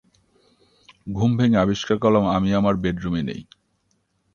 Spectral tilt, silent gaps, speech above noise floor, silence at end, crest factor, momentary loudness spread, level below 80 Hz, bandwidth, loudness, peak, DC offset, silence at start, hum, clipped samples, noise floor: -7.5 dB/octave; none; 49 dB; 0.9 s; 18 dB; 13 LU; -46 dBFS; 7.2 kHz; -21 LUFS; -4 dBFS; under 0.1%; 1.05 s; none; under 0.1%; -68 dBFS